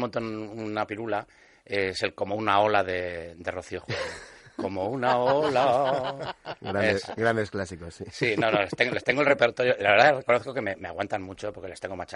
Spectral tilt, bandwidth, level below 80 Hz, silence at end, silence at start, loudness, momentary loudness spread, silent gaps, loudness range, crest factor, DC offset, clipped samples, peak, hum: -5 dB/octave; 11.5 kHz; -60 dBFS; 0 s; 0 s; -26 LUFS; 14 LU; none; 5 LU; 22 dB; under 0.1%; under 0.1%; -4 dBFS; none